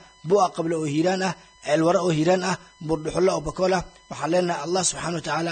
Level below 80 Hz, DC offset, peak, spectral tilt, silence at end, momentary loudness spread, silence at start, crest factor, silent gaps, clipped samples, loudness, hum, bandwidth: -50 dBFS; under 0.1%; -8 dBFS; -4.5 dB/octave; 0 s; 8 LU; 0.25 s; 16 dB; none; under 0.1%; -23 LUFS; none; 9.4 kHz